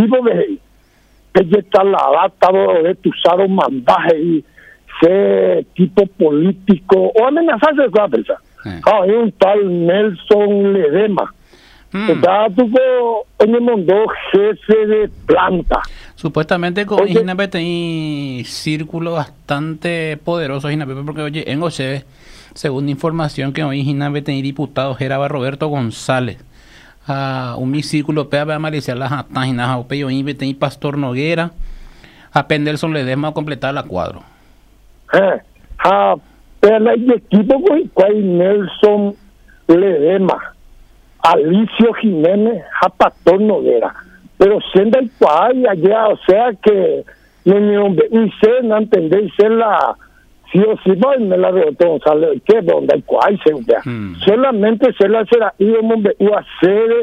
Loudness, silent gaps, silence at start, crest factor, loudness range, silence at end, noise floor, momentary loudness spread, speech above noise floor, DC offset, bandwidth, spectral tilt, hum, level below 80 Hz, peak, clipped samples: -14 LUFS; none; 0 s; 14 dB; 7 LU; 0 s; -50 dBFS; 9 LU; 37 dB; under 0.1%; 11 kHz; -7 dB/octave; none; -42 dBFS; 0 dBFS; under 0.1%